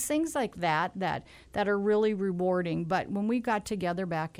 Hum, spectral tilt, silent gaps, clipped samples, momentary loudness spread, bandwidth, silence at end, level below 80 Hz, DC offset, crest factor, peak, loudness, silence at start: none; -5.5 dB/octave; none; under 0.1%; 6 LU; 15.5 kHz; 0 s; -60 dBFS; under 0.1%; 14 dB; -16 dBFS; -30 LUFS; 0 s